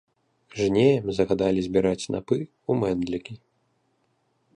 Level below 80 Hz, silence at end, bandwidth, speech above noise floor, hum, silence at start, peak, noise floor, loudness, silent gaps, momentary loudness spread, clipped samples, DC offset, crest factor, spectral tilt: -52 dBFS; 1.2 s; 10.5 kHz; 46 dB; none; 0.55 s; -8 dBFS; -70 dBFS; -24 LUFS; none; 10 LU; under 0.1%; under 0.1%; 18 dB; -6.5 dB/octave